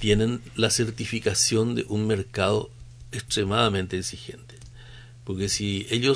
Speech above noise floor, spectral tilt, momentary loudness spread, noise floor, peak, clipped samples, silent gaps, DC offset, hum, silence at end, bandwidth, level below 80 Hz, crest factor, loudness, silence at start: 20 dB; -4 dB/octave; 19 LU; -45 dBFS; -6 dBFS; under 0.1%; none; under 0.1%; none; 0 s; 11 kHz; -46 dBFS; 20 dB; -25 LUFS; 0 s